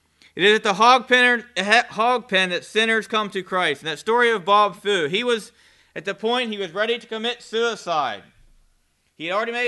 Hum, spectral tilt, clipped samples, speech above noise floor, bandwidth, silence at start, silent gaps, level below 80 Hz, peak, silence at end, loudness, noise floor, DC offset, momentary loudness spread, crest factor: none; -3 dB/octave; under 0.1%; 43 dB; 12.5 kHz; 0.35 s; none; -66 dBFS; 0 dBFS; 0 s; -20 LUFS; -64 dBFS; under 0.1%; 11 LU; 22 dB